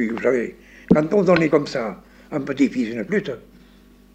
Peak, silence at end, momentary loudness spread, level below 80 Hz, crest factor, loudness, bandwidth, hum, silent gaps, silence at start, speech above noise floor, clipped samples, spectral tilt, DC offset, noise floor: -2 dBFS; 0.75 s; 15 LU; -50 dBFS; 20 dB; -20 LUFS; 9 kHz; none; none; 0 s; 29 dB; under 0.1%; -7 dB/octave; under 0.1%; -50 dBFS